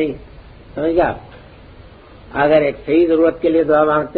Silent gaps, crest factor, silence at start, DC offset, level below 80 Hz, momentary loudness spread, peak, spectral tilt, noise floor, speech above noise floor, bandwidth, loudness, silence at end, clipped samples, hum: none; 16 dB; 0 s; under 0.1%; -42 dBFS; 15 LU; -2 dBFS; -9.5 dB/octave; -40 dBFS; 25 dB; 4.7 kHz; -16 LUFS; 0 s; under 0.1%; none